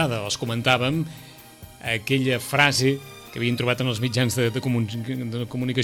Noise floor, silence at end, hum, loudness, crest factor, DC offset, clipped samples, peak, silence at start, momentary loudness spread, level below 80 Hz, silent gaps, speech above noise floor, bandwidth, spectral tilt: -45 dBFS; 0 s; none; -23 LUFS; 20 dB; under 0.1%; under 0.1%; -4 dBFS; 0 s; 10 LU; -56 dBFS; none; 21 dB; 16.5 kHz; -4.5 dB/octave